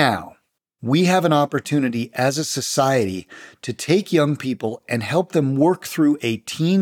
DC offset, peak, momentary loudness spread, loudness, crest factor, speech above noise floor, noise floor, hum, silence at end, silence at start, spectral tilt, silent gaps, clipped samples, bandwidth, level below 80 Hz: under 0.1%; -4 dBFS; 10 LU; -20 LUFS; 16 dB; 41 dB; -60 dBFS; none; 0 s; 0 s; -5.5 dB/octave; none; under 0.1%; 19 kHz; -68 dBFS